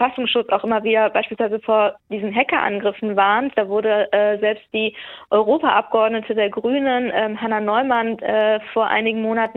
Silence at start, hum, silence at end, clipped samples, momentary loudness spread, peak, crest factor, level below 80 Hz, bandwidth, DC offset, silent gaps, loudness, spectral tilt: 0 s; none; 0.05 s; under 0.1%; 5 LU; -2 dBFS; 18 dB; -64 dBFS; 4.2 kHz; under 0.1%; none; -19 LUFS; -7.5 dB/octave